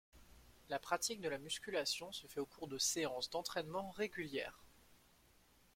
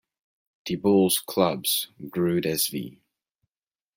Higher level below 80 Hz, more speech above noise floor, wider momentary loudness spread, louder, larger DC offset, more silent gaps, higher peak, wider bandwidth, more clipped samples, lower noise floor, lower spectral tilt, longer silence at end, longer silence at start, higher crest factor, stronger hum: second, -72 dBFS vs -66 dBFS; second, 27 dB vs over 66 dB; second, 9 LU vs 13 LU; second, -42 LUFS vs -24 LUFS; neither; neither; second, -22 dBFS vs -8 dBFS; about the same, 16.5 kHz vs 16.5 kHz; neither; second, -70 dBFS vs under -90 dBFS; second, -2 dB/octave vs -4 dB/octave; second, 0.8 s vs 1.05 s; second, 0.15 s vs 0.65 s; about the same, 24 dB vs 20 dB; neither